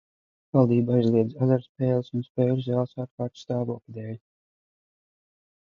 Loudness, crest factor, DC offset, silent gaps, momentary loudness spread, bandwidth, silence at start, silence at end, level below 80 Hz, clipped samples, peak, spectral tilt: -25 LUFS; 20 dB; under 0.1%; 1.69-1.75 s, 2.30-2.35 s, 3.11-3.18 s; 15 LU; 6.8 kHz; 0.55 s; 1.5 s; -66 dBFS; under 0.1%; -6 dBFS; -10 dB/octave